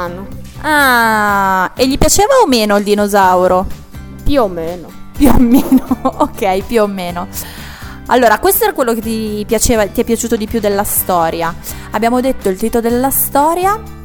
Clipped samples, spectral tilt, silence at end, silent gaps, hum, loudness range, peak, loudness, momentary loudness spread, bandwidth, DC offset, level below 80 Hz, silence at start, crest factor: under 0.1%; -4 dB/octave; 0 s; none; none; 4 LU; 0 dBFS; -12 LUFS; 15 LU; over 20 kHz; under 0.1%; -26 dBFS; 0 s; 12 dB